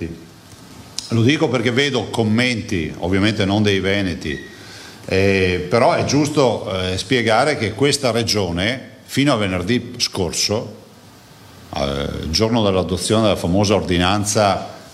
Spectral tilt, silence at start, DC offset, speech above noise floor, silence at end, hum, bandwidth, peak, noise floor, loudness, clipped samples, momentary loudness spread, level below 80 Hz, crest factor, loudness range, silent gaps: -4.5 dB/octave; 0 s; under 0.1%; 26 dB; 0 s; none; 15 kHz; 0 dBFS; -44 dBFS; -18 LUFS; under 0.1%; 10 LU; -42 dBFS; 18 dB; 4 LU; none